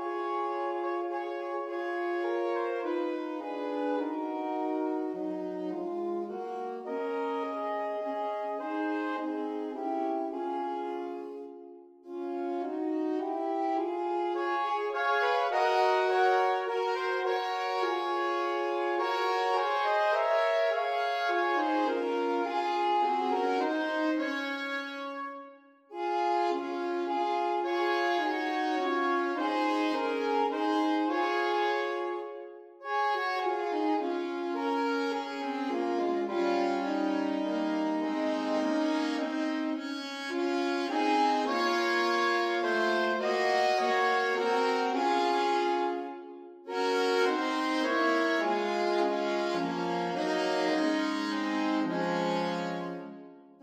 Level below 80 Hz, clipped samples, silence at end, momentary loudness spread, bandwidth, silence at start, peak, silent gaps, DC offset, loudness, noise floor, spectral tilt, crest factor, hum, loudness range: -86 dBFS; under 0.1%; 0.2 s; 9 LU; 14 kHz; 0 s; -14 dBFS; none; under 0.1%; -30 LUFS; -53 dBFS; -4.5 dB/octave; 16 dB; none; 6 LU